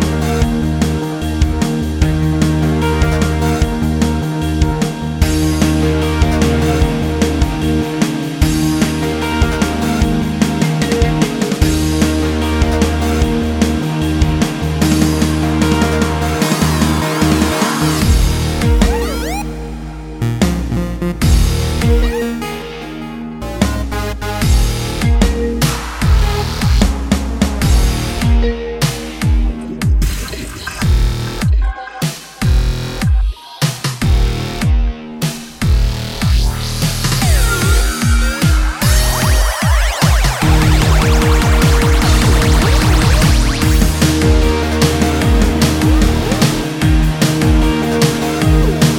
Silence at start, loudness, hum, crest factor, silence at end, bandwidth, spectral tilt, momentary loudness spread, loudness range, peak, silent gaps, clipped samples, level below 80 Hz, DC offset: 0 s; -15 LUFS; none; 14 dB; 0 s; 17 kHz; -5.5 dB/octave; 7 LU; 5 LU; 0 dBFS; none; under 0.1%; -16 dBFS; under 0.1%